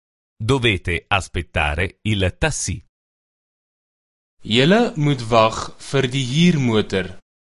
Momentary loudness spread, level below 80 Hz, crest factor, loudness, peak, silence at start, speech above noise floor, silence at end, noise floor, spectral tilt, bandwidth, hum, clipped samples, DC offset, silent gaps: 10 LU; -36 dBFS; 20 dB; -19 LUFS; 0 dBFS; 0.4 s; over 71 dB; 0.35 s; under -90 dBFS; -5 dB/octave; 11.5 kHz; none; under 0.1%; under 0.1%; 2.89-4.37 s